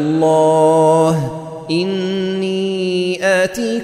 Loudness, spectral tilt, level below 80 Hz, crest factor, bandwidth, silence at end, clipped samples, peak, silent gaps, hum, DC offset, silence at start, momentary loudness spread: -15 LUFS; -5.5 dB/octave; -54 dBFS; 12 dB; 15 kHz; 0 s; under 0.1%; -2 dBFS; none; none; under 0.1%; 0 s; 8 LU